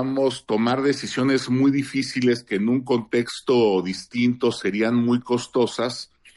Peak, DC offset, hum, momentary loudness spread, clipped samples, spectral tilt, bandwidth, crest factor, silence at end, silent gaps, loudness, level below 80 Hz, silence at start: -8 dBFS; under 0.1%; none; 5 LU; under 0.1%; -5.5 dB/octave; 11.5 kHz; 14 dB; 0.3 s; none; -22 LUFS; -64 dBFS; 0 s